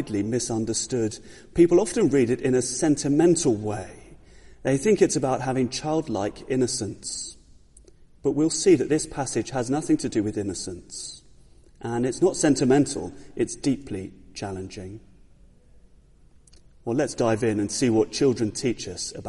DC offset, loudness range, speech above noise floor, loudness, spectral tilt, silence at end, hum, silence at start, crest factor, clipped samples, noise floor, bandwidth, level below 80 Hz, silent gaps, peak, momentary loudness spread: under 0.1%; 9 LU; 30 dB; -24 LUFS; -5 dB/octave; 0 s; none; 0 s; 20 dB; under 0.1%; -54 dBFS; 11.5 kHz; -52 dBFS; none; -6 dBFS; 15 LU